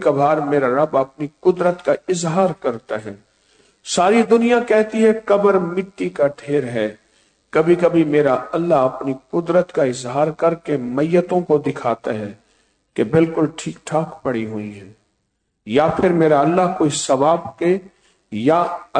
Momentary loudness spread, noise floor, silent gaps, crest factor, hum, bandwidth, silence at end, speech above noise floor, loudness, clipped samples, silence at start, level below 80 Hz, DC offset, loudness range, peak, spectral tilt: 11 LU; -71 dBFS; none; 14 dB; none; 9.4 kHz; 0 s; 53 dB; -18 LUFS; under 0.1%; 0 s; -56 dBFS; under 0.1%; 4 LU; -4 dBFS; -6 dB/octave